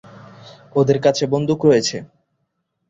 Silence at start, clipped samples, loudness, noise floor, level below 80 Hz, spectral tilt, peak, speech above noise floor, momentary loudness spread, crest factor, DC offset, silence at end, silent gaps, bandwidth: 0.4 s; under 0.1%; -17 LUFS; -72 dBFS; -56 dBFS; -5.5 dB/octave; -2 dBFS; 55 dB; 9 LU; 18 dB; under 0.1%; 0.85 s; none; 8 kHz